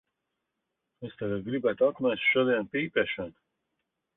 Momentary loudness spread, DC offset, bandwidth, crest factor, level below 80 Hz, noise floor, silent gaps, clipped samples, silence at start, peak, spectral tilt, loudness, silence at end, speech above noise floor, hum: 15 LU; under 0.1%; 4 kHz; 18 dB; -66 dBFS; -83 dBFS; none; under 0.1%; 1 s; -12 dBFS; -9 dB/octave; -28 LUFS; 0.85 s; 55 dB; none